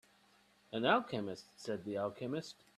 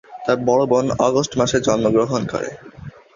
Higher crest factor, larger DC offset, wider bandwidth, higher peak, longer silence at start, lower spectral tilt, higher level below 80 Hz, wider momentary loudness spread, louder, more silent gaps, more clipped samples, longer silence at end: first, 22 dB vs 16 dB; neither; first, 14 kHz vs 7.6 kHz; second, -16 dBFS vs -2 dBFS; first, 0.7 s vs 0.1 s; about the same, -5.5 dB/octave vs -5 dB/octave; second, -78 dBFS vs -48 dBFS; about the same, 13 LU vs 12 LU; second, -38 LUFS vs -18 LUFS; neither; neither; about the same, 0.25 s vs 0.25 s